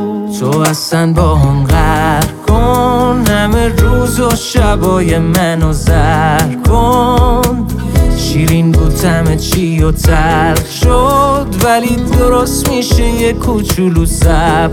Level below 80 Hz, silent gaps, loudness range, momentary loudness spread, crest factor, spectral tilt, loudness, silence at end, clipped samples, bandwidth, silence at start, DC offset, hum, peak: -16 dBFS; none; 1 LU; 3 LU; 10 dB; -5.5 dB/octave; -11 LUFS; 0 s; under 0.1%; 17.5 kHz; 0 s; under 0.1%; none; 0 dBFS